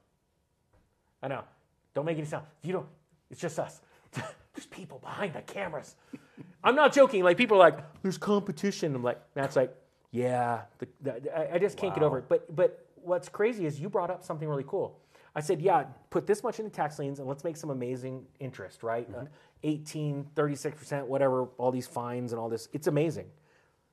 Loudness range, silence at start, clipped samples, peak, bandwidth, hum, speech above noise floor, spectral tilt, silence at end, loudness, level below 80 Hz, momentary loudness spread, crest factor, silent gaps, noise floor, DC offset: 13 LU; 1.2 s; under 0.1%; -4 dBFS; 13 kHz; none; 45 dB; -6 dB/octave; 0.65 s; -30 LUFS; -74 dBFS; 18 LU; 26 dB; none; -75 dBFS; under 0.1%